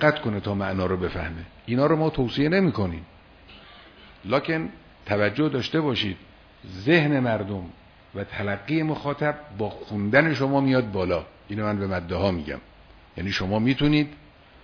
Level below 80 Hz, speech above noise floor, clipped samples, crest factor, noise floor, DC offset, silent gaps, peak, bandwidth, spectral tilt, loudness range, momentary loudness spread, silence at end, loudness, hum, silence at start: -48 dBFS; 25 dB; under 0.1%; 22 dB; -49 dBFS; under 0.1%; none; -4 dBFS; 5.4 kHz; -7.5 dB/octave; 3 LU; 15 LU; 0.5 s; -25 LUFS; none; 0 s